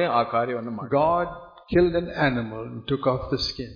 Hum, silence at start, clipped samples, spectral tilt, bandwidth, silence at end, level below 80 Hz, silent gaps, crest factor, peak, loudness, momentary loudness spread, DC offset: none; 0 s; under 0.1%; -7 dB/octave; 5.4 kHz; 0 s; -46 dBFS; none; 18 dB; -8 dBFS; -24 LUFS; 11 LU; under 0.1%